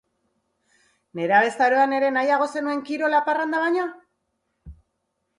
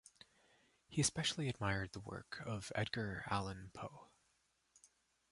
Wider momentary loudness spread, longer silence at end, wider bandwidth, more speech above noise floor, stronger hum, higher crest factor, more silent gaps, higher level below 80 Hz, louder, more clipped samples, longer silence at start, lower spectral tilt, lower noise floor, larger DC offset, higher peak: second, 8 LU vs 14 LU; first, 0.65 s vs 0.45 s; about the same, 11.5 kHz vs 11.5 kHz; first, 55 dB vs 38 dB; neither; about the same, 18 dB vs 22 dB; neither; first, -58 dBFS vs -64 dBFS; first, -21 LUFS vs -41 LUFS; neither; first, 1.15 s vs 0.9 s; first, -5 dB/octave vs -3.5 dB/octave; second, -76 dBFS vs -80 dBFS; neither; first, -6 dBFS vs -22 dBFS